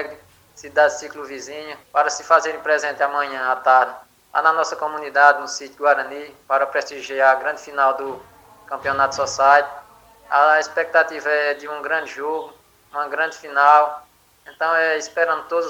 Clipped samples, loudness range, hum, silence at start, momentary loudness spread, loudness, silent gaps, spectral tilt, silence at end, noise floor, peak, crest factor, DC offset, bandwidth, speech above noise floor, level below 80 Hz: under 0.1%; 2 LU; none; 0 s; 16 LU; -19 LUFS; none; -1.5 dB/octave; 0 s; -48 dBFS; 0 dBFS; 20 dB; under 0.1%; 17 kHz; 29 dB; -64 dBFS